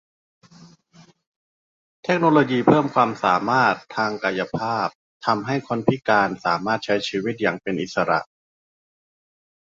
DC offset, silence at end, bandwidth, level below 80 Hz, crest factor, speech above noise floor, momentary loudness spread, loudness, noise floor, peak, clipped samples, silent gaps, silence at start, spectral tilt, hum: under 0.1%; 1.5 s; 7.8 kHz; -62 dBFS; 20 dB; 32 dB; 8 LU; -21 LUFS; -53 dBFS; -2 dBFS; under 0.1%; 1.27-2.03 s, 4.95-5.20 s; 0.6 s; -6 dB/octave; none